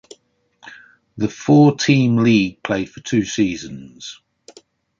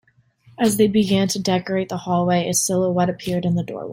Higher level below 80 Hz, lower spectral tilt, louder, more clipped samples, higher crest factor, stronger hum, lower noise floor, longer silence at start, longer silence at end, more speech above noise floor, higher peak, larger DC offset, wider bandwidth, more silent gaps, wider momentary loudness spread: about the same, -54 dBFS vs -54 dBFS; about the same, -6 dB/octave vs -5 dB/octave; first, -17 LUFS vs -20 LUFS; neither; about the same, 18 dB vs 16 dB; neither; about the same, -58 dBFS vs -55 dBFS; about the same, 0.7 s vs 0.6 s; first, 0.85 s vs 0 s; first, 42 dB vs 35 dB; about the same, -2 dBFS vs -4 dBFS; neither; second, 7.6 kHz vs 16.5 kHz; neither; first, 21 LU vs 6 LU